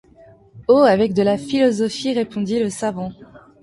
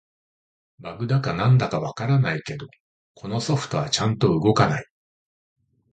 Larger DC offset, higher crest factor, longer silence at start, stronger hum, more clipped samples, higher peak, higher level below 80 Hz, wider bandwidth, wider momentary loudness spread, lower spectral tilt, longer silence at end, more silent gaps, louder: neither; about the same, 16 dB vs 20 dB; second, 0.55 s vs 0.8 s; neither; neither; about the same, -4 dBFS vs -4 dBFS; about the same, -54 dBFS vs -52 dBFS; first, 11.5 kHz vs 9 kHz; second, 12 LU vs 17 LU; about the same, -5.5 dB/octave vs -6 dB/octave; second, 0.25 s vs 1.1 s; second, none vs 2.80-3.15 s; first, -18 LUFS vs -22 LUFS